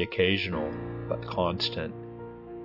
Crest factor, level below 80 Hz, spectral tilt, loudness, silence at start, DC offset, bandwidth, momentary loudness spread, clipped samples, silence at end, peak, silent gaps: 22 dB; -54 dBFS; -6.5 dB/octave; -29 LUFS; 0 s; under 0.1%; 5.8 kHz; 17 LU; under 0.1%; 0 s; -10 dBFS; none